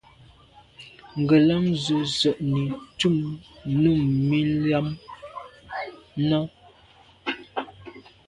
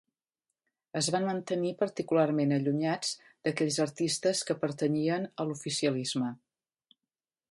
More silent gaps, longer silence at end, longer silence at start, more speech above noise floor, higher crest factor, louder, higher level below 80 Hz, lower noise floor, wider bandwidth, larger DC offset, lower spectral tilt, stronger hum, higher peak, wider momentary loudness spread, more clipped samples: neither; second, 0.3 s vs 1.15 s; second, 0.8 s vs 0.95 s; second, 32 dB vs over 60 dB; about the same, 18 dB vs 18 dB; first, -24 LUFS vs -31 LUFS; first, -54 dBFS vs -76 dBFS; second, -54 dBFS vs under -90 dBFS; about the same, 11 kHz vs 11.5 kHz; neither; first, -6.5 dB/octave vs -4.5 dB/octave; neither; first, -6 dBFS vs -14 dBFS; first, 19 LU vs 7 LU; neither